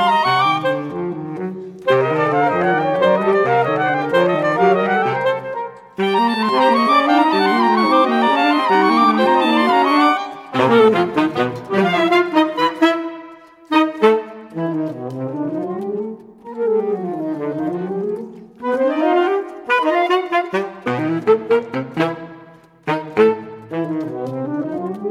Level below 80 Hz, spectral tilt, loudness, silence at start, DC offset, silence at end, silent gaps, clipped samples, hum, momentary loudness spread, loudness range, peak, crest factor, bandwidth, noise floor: -64 dBFS; -6.5 dB/octave; -17 LUFS; 0 s; under 0.1%; 0 s; none; under 0.1%; none; 12 LU; 8 LU; 0 dBFS; 16 dB; 14 kHz; -44 dBFS